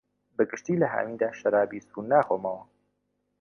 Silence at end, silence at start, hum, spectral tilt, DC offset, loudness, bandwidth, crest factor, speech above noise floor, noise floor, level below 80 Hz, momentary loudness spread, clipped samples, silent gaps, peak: 0.8 s; 0.4 s; 50 Hz at -60 dBFS; -7.5 dB/octave; under 0.1%; -27 LUFS; 6.8 kHz; 20 dB; 50 dB; -77 dBFS; -72 dBFS; 12 LU; under 0.1%; none; -8 dBFS